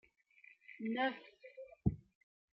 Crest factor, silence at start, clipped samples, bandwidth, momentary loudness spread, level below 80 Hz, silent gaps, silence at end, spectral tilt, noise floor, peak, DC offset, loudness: 24 dB; 0.7 s; under 0.1%; 5.8 kHz; 20 LU; -58 dBFS; none; 0.55 s; -5 dB/octave; -66 dBFS; -18 dBFS; under 0.1%; -40 LUFS